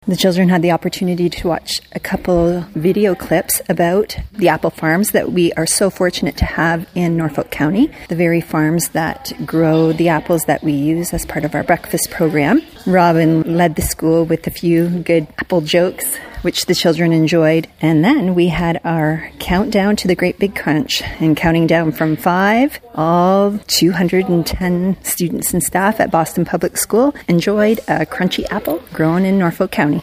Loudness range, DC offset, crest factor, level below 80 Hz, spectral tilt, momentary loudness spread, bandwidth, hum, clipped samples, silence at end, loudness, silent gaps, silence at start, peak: 2 LU; under 0.1%; 14 dB; -38 dBFS; -5 dB/octave; 6 LU; 15.5 kHz; none; under 0.1%; 0 s; -15 LUFS; none; 0.05 s; 0 dBFS